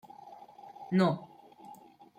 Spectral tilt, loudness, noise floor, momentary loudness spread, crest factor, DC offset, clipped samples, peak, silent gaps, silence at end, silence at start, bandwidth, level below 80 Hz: -8 dB/octave; -30 LUFS; -54 dBFS; 26 LU; 20 dB; under 0.1%; under 0.1%; -16 dBFS; none; 0.45 s; 0.25 s; 9 kHz; -76 dBFS